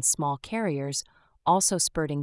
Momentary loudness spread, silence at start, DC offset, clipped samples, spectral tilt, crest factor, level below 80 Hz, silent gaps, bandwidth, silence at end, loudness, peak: 9 LU; 0 s; under 0.1%; under 0.1%; -3.5 dB/octave; 18 dB; -54 dBFS; none; 12 kHz; 0 s; -26 LUFS; -8 dBFS